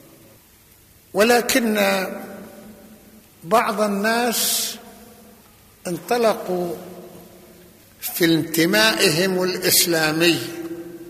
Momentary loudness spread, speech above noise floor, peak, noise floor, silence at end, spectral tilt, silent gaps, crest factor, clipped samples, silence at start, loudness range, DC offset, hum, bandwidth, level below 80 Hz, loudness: 19 LU; 32 dB; -2 dBFS; -51 dBFS; 0 s; -3 dB/octave; none; 20 dB; under 0.1%; 1.15 s; 7 LU; under 0.1%; none; 15 kHz; -60 dBFS; -19 LUFS